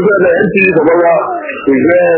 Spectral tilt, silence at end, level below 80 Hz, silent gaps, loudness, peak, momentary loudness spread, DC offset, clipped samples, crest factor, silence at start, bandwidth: -11 dB/octave; 0 s; -46 dBFS; none; -9 LUFS; 0 dBFS; 6 LU; under 0.1%; 0.2%; 8 dB; 0 s; 4 kHz